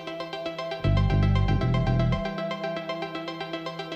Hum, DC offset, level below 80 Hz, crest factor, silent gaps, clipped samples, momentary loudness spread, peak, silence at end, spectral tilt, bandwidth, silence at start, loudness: none; under 0.1%; -34 dBFS; 14 dB; none; under 0.1%; 10 LU; -12 dBFS; 0 s; -7.5 dB/octave; 7.8 kHz; 0 s; -27 LUFS